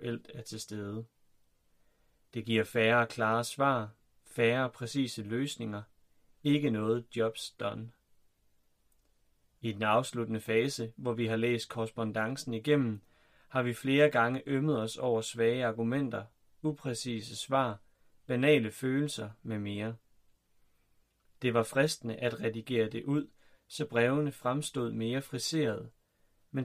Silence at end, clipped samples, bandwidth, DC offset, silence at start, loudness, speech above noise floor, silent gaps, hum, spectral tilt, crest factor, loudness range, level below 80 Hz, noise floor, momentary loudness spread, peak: 0 s; under 0.1%; 15.5 kHz; under 0.1%; 0 s; -32 LUFS; 39 dB; none; none; -5.5 dB/octave; 20 dB; 5 LU; -70 dBFS; -70 dBFS; 13 LU; -14 dBFS